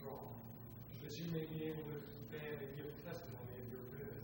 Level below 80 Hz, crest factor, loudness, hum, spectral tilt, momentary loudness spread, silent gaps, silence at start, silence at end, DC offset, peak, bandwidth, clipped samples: -68 dBFS; 18 dB; -49 LUFS; none; -6.5 dB/octave; 8 LU; none; 0 s; 0 s; under 0.1%; -32 dBFS; 16 kHz; under 0.1%